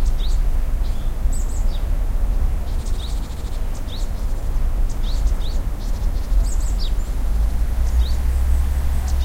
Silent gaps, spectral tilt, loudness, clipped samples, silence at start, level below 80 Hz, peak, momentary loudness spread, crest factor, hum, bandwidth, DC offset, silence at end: none; -5.5 dB/octave; -25 LUFS; under 0.1%; 0 s; -18 dBFS; -6 dBFS; 7 LU; 12 dB; none; 15.5 kHz; under 0.1%; 0 s